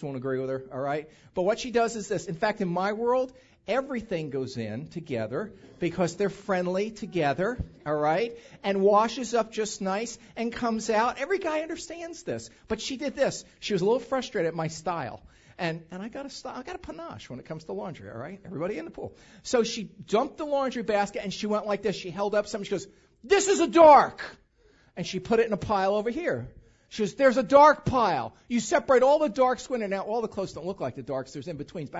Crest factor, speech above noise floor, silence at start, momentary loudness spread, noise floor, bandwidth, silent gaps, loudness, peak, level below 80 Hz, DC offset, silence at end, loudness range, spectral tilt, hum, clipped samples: 22 dB; 35 dB; 0 s; 16 LU; -61 dBFS; 8 kHz; none; -27 LUFS; -4 dBFS; -56 dBFS; under 0.1%; 0 s; 11 LU; -5 dB/octave; none; under 0.1%